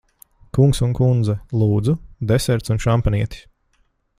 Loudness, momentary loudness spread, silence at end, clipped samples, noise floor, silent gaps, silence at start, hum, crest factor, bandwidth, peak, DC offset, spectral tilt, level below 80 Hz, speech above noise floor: -19 LUFS; 7 LU; 0.8 s; under 0.1%; -63 dBFS; none; 0.55 s; none; 16 dB; 15 kHz; -2 dBFS; under 0.1%; -7 dB/octave; -34 dBFS; 46 dB